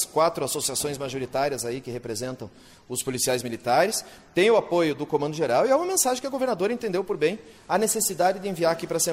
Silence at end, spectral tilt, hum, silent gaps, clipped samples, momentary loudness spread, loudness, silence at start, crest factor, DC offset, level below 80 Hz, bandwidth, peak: 0 s; -3.5 dB/octave; none; none; under 0.1%; 10 LU; -25 LUFS; 0 s; 16 dB; under 0.1%; -62 dBFS; 16 kHz; -10 dBFS